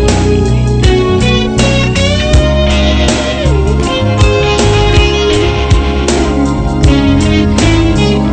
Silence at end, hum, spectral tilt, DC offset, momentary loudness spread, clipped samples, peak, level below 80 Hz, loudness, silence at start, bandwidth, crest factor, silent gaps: 0 s; none; -5.5 dB/octave; under 0.1%; 3 LU; 0.2%; 0 dBFS; -14 dBFS; -10 LUFS; 0 s; 9.2 kHz; 8 dB; none